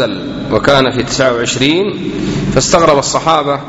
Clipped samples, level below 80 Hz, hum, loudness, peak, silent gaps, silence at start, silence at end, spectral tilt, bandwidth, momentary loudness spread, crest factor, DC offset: 0.4%; -34 dBFS; none; -12 LUFS; 0 dBFS; none; 0 s; 0 s; -4 dB/octave; 10.5 kHz; 8 LU; 12 dB; under 0.1%